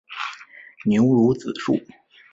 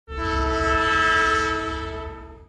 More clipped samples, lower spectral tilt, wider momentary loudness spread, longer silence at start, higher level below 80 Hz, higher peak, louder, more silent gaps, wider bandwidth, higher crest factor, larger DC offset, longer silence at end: neither; first, -7.5 dB/octave vs -4 dB/octave; about the same, 14 LU vs 14 LU; about the same, 0.1 s vs 0.1 s; second, -58 dBFS vs -34 dBFS; first, -6 dBFS vs -10 dBFS; about the same, -21 LUFS vs -21 LUFS; neither; second, 7.8 kHz vs 11.5 kHz; about the same, 16 dB vs 14 dB; neither; first, 0.55 s vs 0.05 s